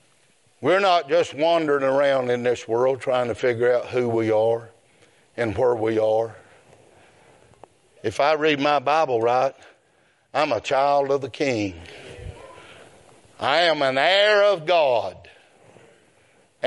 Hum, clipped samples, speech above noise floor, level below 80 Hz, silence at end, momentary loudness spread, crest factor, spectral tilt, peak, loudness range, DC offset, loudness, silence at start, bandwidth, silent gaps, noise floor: none; under 0.1%; 41 dB; -60 dBFS; 0 s; 11 LU; 18 dB; -5 dB/octave; -4 dBFS; 4 LU; under 0.1%; -21 LUFS; 0.6 s; 11.5 kHz; none; -62 dBFS